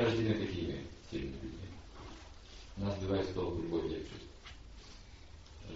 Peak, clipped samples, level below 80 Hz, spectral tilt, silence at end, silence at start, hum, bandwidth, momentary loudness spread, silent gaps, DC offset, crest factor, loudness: -18 dBFS; under 0.1%; -52 dBFS; -6 dB/octave; 0 s; 0 s; none; 7.6 kHz; 19 LU; none; under 0.1%; 20 dB; -38 LUFS